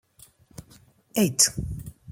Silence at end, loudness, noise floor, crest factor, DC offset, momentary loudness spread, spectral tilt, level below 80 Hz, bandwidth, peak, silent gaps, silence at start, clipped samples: 0 s; -22 LUFS; -56 dBFS; 24 dB; under 0.1%; 17 LU; -3 dB/octave; -46 dBFS; 16.5 kHz; -4 dBFS; none; 0.6 s; under 0.1%